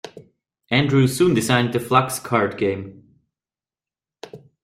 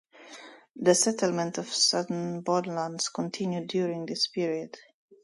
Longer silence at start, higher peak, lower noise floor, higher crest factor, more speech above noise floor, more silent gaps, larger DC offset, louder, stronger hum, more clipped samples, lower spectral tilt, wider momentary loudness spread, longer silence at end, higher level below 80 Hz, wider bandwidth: about the same, 0.05 s vs 0.15 s; first, -2 dBFS vs -8 dBFS; first, under -90 dBFS vs -49 dBFS; about the same, 20 dB vs 22 dB; first, over 71 dB vs 21 dB; second, none vs 0.71-0.75 s; neither; first, -19 LUFS vs -28 LUFS; neither; neither; first, -5.5 dB/octave vs -3.5 dB/octave; first, 24 LU vs 21 LU; second, 0.25 s vs 0.45 s; first, -56 dBFS vs -76 dBFS; first, 16 kHz vs 11.5 kHz